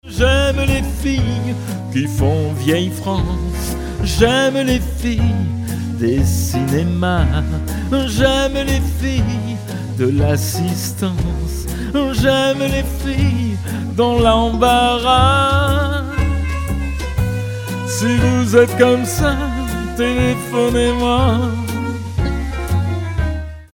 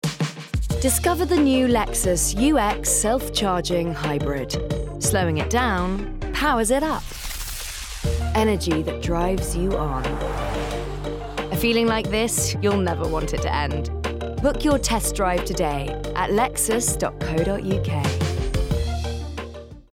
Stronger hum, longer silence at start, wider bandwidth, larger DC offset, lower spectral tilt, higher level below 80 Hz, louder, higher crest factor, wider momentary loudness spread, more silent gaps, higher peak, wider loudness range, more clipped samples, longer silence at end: neither; about the same, 0.05 s vs 0.05 s; about the same, 17.5 kHz vs 17.5 kHz; neither; about the same, -5.5 dB/octave vs -4.5 dB/octave; first, -24 dBFS vs -32 dBFS; first, -17 LUFS vs -23 LUFS; about the same, 16 dB vs 14 dB; about the same, 9 LU vs 9 LU; neither; first, 0 dBFS vs -10 dBFS; about the same, 4 LU vs 4 LU; neither; about the same, 0.1 s vs 0.1 s